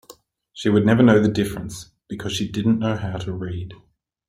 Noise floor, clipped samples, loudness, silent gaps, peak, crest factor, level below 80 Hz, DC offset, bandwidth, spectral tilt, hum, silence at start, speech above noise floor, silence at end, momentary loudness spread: -50 dBFS; under 0.1%; -20 LUFS; none; -2 dBFS; 18 dB; -50 dBFS; under 0.1%; 15 kHz; -6.5 dB/octave; none; 0.1 s; 30 dB; 0.55 s; 19 LU